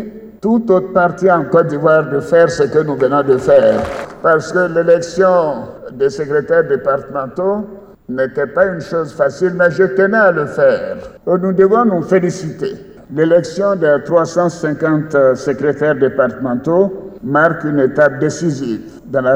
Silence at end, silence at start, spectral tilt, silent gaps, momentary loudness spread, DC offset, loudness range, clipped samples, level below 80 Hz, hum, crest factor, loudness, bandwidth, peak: 0 s; 0 s; -7 dB/octave; none; 11 LU; under 0.1%; 4 LU; under 0.1%; -48 dBFS; none; 12 dB; -14 LUFS; 9.6 kHz; 0 dBFS